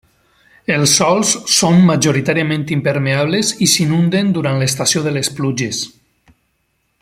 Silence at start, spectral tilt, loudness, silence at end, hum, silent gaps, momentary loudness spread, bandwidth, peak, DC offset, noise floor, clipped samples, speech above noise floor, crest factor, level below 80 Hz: 0.7 s; -4 dB/octave; -14 LUFS; 1.15 s; none; none; 8 LU; 16 kHz; 0 dBFS; under 0.1%; -65 dBFS; under 0.1%; 51 dB; 16 dB; -52 dBFS